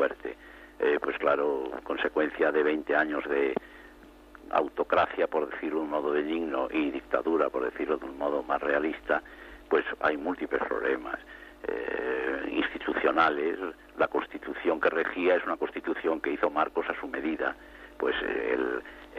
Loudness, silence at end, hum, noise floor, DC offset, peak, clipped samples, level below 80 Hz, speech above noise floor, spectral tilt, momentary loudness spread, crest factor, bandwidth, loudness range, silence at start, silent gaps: -29 LUFS; 0 s; none; -52 dBFS; under 0.1%; -10 dBFS; under 0.1%; -58 dBFS; 23 dB; -6 dB/octave; 10 LU; 20 dB; 7.6 kHz; 2 LU; 0 s; none